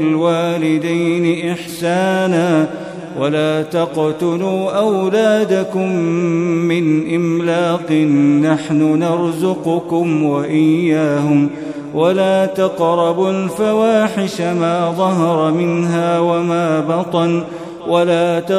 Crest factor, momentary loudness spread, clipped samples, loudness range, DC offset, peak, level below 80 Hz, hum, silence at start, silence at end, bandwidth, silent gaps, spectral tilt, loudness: 14 dB; 5 LU; under 0.1%; 2 LU; under 0.1%; -2 dBFS; -60 dBFS; none; 0 s; 0 s; 13.5 kHz; none; -6.5 dB/octave; -15 LUFS